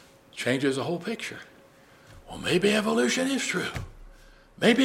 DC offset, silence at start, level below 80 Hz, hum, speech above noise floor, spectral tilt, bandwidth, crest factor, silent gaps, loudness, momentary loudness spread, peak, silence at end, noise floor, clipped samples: under 0.1%; 0.35 s; -54 dBFS; none; 28 dB; -4 dB/octave; 16 kHz; 20 dB; none; -26 LUFS; 19 LU; -6 dBFS; 0 s; -55 dBFS; under 0.1%